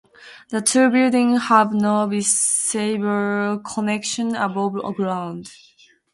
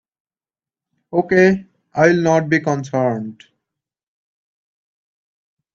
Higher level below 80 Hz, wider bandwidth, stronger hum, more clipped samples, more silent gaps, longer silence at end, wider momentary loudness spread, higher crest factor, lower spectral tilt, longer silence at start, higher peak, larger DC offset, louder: second, -66 dBFS vs -58 dBFS; first, 12 kHz vs 7.4 kHz; neither; neither; neither; second, 0.6 s vs 2.4 s; second, 9 LU vs 12 LU; about the same, 18 dB vs 20 dB; second, -3.5 dB/octave vs -6.5 dB/octave; second, 0.2 s vs 1.1 s; about the same, -2 dBFS vs 0 dBFS; neither; about the same, -19 LUFS vs -17 LUFS